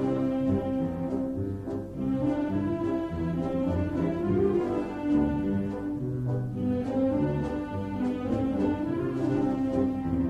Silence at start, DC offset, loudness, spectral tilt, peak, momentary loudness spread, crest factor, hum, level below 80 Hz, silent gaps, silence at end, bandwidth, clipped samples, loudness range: 0 s; under 0.1%; -29 LUFS; -9.5 dB/octave; -14 dBFS; 6 LU; 14 dB; none; -46 dBFS; none; 0 s; 8.4 kHz; under 0.1%; 2 LU